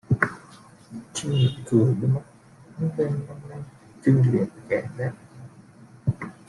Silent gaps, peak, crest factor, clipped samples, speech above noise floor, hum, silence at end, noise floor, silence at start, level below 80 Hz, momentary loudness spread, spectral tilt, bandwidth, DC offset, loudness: none; -4 dBFS; 22 dB; under 0.1%; 26 dB; none; 0.15 s; -49 dBFS; 0.1 s; -56 dBFS; 23 LU; -7 dB/octave; 11.5 kHz; under 0.1%; -25 LUFS